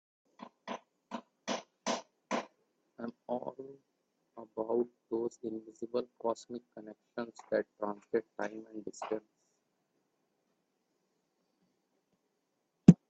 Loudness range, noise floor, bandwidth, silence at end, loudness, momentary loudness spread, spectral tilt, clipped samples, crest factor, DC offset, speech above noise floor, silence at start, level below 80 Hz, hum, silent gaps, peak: 6 LU; -81 dBFS; 8.2 kHz; 0.15 s; -37 LUFS; 15 LU; -7 dB/octave; under 0.1%; 32 dB; under 0.1%; 43 dB; 0.4 s; -68 dBFS; none; none; -4 dBFS